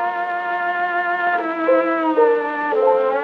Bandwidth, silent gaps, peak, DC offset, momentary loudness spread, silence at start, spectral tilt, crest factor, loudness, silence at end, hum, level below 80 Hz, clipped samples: 5.8 kHz; none; -4 dBFS; under 0.1%; 5 LU; 0 s; -5.5 dB/octave; 14 dB; -18 LUFS; 0 s; none; -80 dBFS; under 0.1%